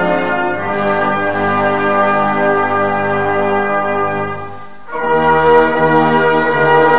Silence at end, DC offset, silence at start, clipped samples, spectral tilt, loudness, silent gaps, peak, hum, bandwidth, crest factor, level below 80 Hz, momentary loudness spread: 0 s; 3%; 0 s; under 0.1%; -9 dB/octave; -13 LUFS; none; 0 dBFS; none; 4.8 kHz; 14 dB; -46 dBFS; 9 LU